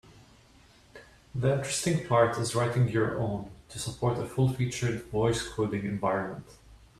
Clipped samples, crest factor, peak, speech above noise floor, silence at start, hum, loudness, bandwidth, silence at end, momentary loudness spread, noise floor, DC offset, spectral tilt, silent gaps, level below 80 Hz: under 0.1%; 20 dB; -10 dBFS; 30 dB; 0.95 s; none; -29 LUFS; 13.5 kHz; 0.25 s; 11 LU; -58 dBFS; under 0.1%; -5.5 dB/octave; none; -54 dBFS